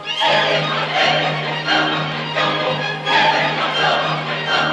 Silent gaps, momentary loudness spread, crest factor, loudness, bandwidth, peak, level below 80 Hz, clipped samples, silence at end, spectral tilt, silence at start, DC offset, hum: none; 6 LU; 14 dB; -17 LUFS; 10.5 kHz; -4 dBFS; -58 dBFS; under 0.1%; 0 s; -4 dB/octave; 0 s; under 0.1%; none